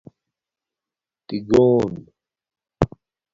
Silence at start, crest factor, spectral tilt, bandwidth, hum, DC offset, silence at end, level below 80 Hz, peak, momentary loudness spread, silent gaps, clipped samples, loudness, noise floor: 1.3 s; 22 dB; -8 dB/octave; 7.6 kHz; none; under 0.1%; 0.45 s; -46 dBFS; 0 dBFS; 16 LU; none; under 0.1%; -20 LUFS; -89 dBFS